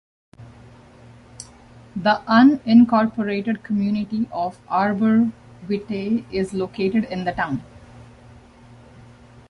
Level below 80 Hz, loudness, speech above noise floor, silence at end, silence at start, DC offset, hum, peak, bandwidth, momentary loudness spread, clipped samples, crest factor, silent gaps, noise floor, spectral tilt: -54 dBFS; -20 LUFS; 27 dB; 1.85 s; 0.4 s; under 0.1%; none; -2 dBFS; 10.5 kHz; 16 LU; under 0.1%; 18 dB; none; -46 dBFS; -7 dB/octave